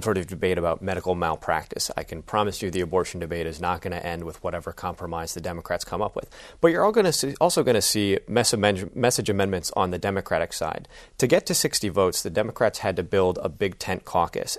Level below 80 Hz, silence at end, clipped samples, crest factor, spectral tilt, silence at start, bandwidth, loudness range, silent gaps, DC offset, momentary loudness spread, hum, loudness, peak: -48 dBFS; 0 s; under 0.1%; 22 dB; -4 dB/octave; 0 s; 13.5 kHz; 7 LU; none; under 0.1%; 11 LU; none; -25 LUFS; -4 dBFS